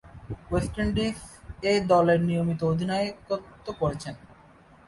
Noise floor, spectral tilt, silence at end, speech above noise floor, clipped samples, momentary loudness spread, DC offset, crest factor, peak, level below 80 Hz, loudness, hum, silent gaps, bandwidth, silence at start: -54 dBFS; -6.5 dB/octave; 0.7 s; 28 dB; under 0.1%; 19 LU; under 0.1%; 18 dB; -10 dBFS; -44 dBFS; -26 LUFS; none; none; 11.5 kHz; 0.05 s